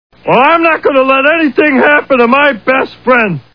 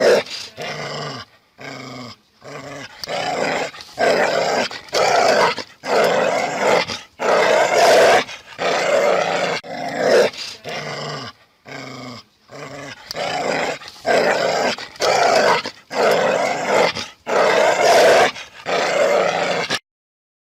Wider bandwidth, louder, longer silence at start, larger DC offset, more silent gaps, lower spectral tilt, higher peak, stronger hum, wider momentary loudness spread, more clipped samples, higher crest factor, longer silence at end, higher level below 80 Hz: second, 5.4 kHz vs 16 kHz; first, -8 LUFS vs -18 LUFS; first, 0.25 s vs 0 s; first, 0.4% vs under 0.1%; neither; first, -7.5 dB/octave vs -2.5 dB/octave; first, 0 dBFS vs -6 dBFS; neither; second, 5 LU vs 19 LU; first, 0.7% vs under 0.1%; about the same, 10 dB vs 14 dB; second, 0.15 s vs 0.75 s; first, -50 dBFS vs -62 dBFS